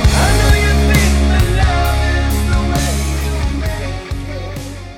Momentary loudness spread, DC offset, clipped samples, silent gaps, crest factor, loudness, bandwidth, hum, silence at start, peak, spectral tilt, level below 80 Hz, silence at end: 12 LU; under 0.1%; under 0.1%; none; 12 dB; -15 LUFS; 16.5 kHz; none; 0 s; 0 dBFS; -5 dB/octave; -16 dBFS; 0 s